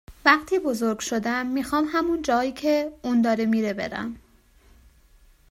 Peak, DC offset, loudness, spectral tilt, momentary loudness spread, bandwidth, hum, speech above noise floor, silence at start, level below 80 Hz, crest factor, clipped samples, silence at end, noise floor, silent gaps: -2 dBFS; under 0.1%; -24 LUFS; -4 dB/octave; 10 LU; 16 kHz; none; 33 dB; 0.1 s; -54 dBFS; 22 dB; under 0.1%; 1.35 s; -56 dBFS; none